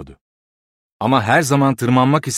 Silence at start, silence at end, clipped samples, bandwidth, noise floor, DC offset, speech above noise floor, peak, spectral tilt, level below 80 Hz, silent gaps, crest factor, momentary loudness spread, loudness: 0 s; 0 s; under 0.1%; 15.5 kHz; under -90 dBFS; under 0.1%; over 75 dB; -2 dBFS; -5.5 dB/octave; -54 dBFS; 0.21-1.00 s; 16 dB; 4 LU; -16 LUFS